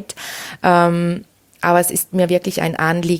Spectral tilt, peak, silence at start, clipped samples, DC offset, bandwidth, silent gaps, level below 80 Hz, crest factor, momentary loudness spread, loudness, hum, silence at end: -5 dB/octave; 0 dBFS; 0 s; under 0.1%; under 0.1%; 17.5 kHz; none; -56 dBFS; 16 dB; 14 LU; -17 LUFS; none; 0 s